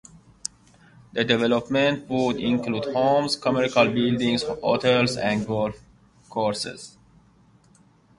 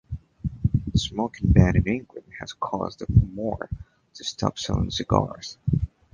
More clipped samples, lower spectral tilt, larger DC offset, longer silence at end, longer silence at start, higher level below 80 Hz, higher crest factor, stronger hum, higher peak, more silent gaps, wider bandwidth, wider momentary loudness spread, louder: neither; second, -5 dB/octave vs -6.5 dB/octave; neither; first, 1.3 s vs 0.25 s; first, 1.15 s vs 0.1 s; second, -56 dBFS vs -34 dBFS; about the same, 20 dB vs 24 dB; neither; second, -4 dBFS vs 0 dBFS; neither; first, 11.5 kHz vs 9.2 kHz; about the same, 13 LU vs 15 LU; about the same, -23 LUFS vs -25 LUFS